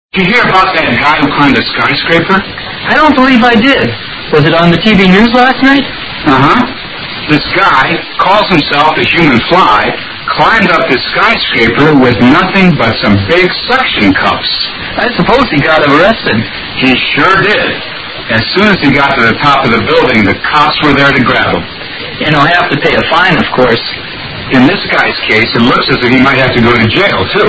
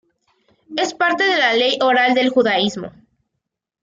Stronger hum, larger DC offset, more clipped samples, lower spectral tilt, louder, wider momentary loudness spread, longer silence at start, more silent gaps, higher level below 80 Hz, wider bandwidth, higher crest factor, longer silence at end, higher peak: neither; neither; first, 2% vs under 0.1%; first, -6.5 dB/octave vs -3.5 dB/octave; first, -7 LUFS vs -16 LUFS; second, 8 LU vs 11 LU; second, 0.15 s vs 0.7 s; neither; first, -32 dBFS vs -64 dBFS; about the same, 8 kHz vs 7.8 kHz; second, 8 dB vs 14 dB; second, 0 s vs 0.95 s; first, 0 dBFS vs -4 dBFS